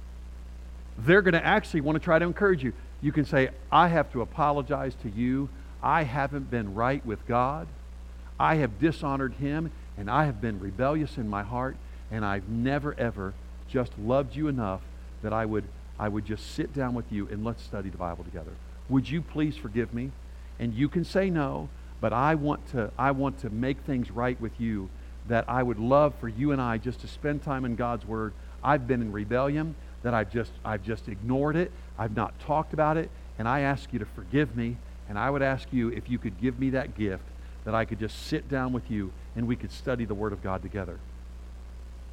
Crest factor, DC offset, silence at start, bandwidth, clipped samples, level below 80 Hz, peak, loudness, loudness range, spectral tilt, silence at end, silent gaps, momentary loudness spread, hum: 22 dB; under 0.1%; 0 s; 15 kHz; under 0.1%; -42 dBFS; -6 dBFS; -29 LUFS; 6 LU; -7.5 dB/octave; 0 s; none; 14 LU; none